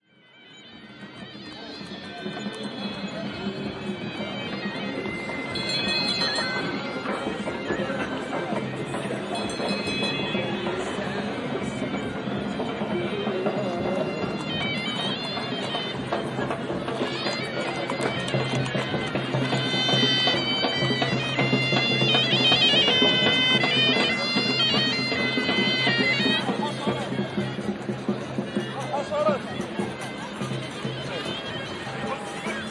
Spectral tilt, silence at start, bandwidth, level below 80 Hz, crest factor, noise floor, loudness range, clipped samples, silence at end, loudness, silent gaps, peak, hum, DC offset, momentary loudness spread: -4.5 dB/octave; 0.35 s; 11.5 kHz; -58 dBFS; 20 dB; -53 dBFS; 12 LU; under 0.1%; 0 s; -25 LUFS; none; -6 dBFS; none; under 0.1%; 13 LU